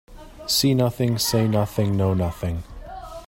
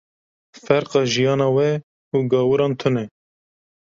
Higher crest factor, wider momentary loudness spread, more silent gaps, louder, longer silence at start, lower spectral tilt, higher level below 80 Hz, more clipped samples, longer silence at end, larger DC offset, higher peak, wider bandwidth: about the same, 16 dB vs 18 dB; first, 17 LU vs 8 LU; second, none vs 1.83-2.11 s; about the same, -22 LUFS vs -20 LUFS; second, 0.1 s vs 0.55 s; about the same, -5 dB/octave vs -6 dB/octave; first, -42 dBFS vs -60 dBFS; neither; second, 0 s vs 0.9 s; neither; about the same, -6 dBFS vs -4 dBFS; first, 16.5 kHz vs 7.6 kHz